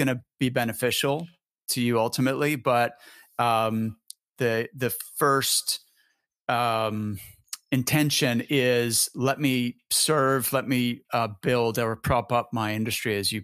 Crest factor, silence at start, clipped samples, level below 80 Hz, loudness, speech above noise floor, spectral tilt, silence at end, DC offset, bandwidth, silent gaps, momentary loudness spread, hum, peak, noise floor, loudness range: 18 dB; 0 s; under 0.1%; -56 dBFS; -25 LUFS; 45 dB; -4 dB/octave; 0 s; under 0.1%; 15.5 kHz; 1.51-1.55 s, 6.41-6.46 s; 9 LU; none; -8 dBFS; -70 dBFS; 3 LU